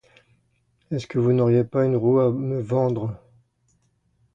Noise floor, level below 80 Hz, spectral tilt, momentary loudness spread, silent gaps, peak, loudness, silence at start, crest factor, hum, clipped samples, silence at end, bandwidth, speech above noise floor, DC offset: -67 dBFS; -58 dBFS; -9.5 dB/octave; 12 LU; none; -8 dBFS; -22 LUFS; 0.9 s; 16 dB; none; under 0.1%; 1.2 s; 7.6 kHz; 46 dB; under 0.1%